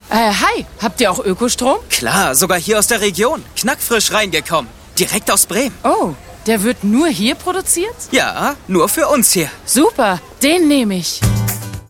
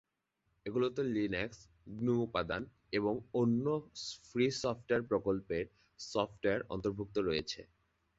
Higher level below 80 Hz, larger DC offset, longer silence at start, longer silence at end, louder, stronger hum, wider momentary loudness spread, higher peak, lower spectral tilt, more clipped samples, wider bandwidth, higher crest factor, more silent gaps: first, -38 dBFS vs -62 dBFS; neither; second, 0.05 s vs 0.65 s; second, 0.1 s vs 0.55 s; first, -14 LUFS vs -36 LUFS; neither; second, 6 LU vs 11 LU; first, 0 dBFS vs -16 dBFS; second, -3 dB/octave vs -5.5 dB/octave; neither; first, 17 kHz vs 8 kHz; about the same, 16 dB vs 20 dB; neither